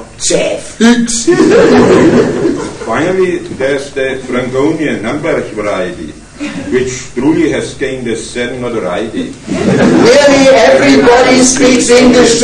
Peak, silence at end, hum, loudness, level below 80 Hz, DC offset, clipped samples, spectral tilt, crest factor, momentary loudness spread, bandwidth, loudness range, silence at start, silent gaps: 0 dBFS; 0 s; none; -9 LUFS; -36 dBFS; under 0.1%; 2%; -4 dB/octave; 8 dB; 12 LU; 12 kHz; 8 LU; 0 s; none